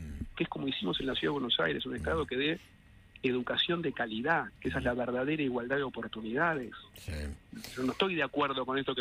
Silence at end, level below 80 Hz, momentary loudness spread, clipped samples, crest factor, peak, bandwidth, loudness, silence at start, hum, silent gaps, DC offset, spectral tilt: 0 s; -52 dBFS; 11 LU; under 0.1%; 18 dB; -16 dBFS; 15.5 kHz; -33 LUFS; 0 s; none; none; under 0.1%; -5.5 dB/octave